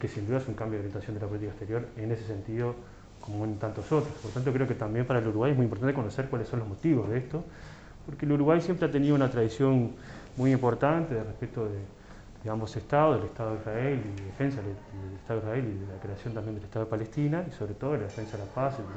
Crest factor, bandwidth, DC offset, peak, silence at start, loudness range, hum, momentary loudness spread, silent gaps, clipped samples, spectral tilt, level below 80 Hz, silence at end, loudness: 18 dB; 8.2 kHz; under 0.1%; -12 dBFS; 0 s; 7 LU; none; 14 LU; none; under 0.1%; -8.5 dB/octave; -52 dBFS; 0 s; -30 LUFS